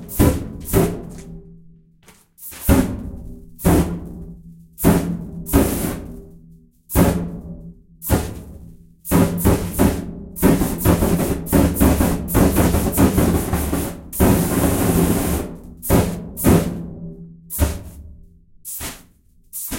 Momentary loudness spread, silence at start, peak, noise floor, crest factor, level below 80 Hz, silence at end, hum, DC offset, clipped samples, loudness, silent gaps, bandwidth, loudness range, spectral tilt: 19 LU; 0 s; 0 dBFS; -52 dBFS; 18 dB; -28 dBFS; 0 s; none; under 0.1%; under 0.1%; -19 LUFS; none; 16.5 kHz; 6 LU; -6 dB/octave